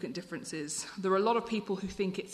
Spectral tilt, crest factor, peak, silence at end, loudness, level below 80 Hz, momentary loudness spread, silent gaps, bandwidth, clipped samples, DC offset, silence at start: -4.5 dB/octave; 16 dB; -18 dBFS; 0 s; -33 LUFS; -62 dBFS; 11 LU; none; 13.5 kHz; under 0.1%; under 0.1%; 0 s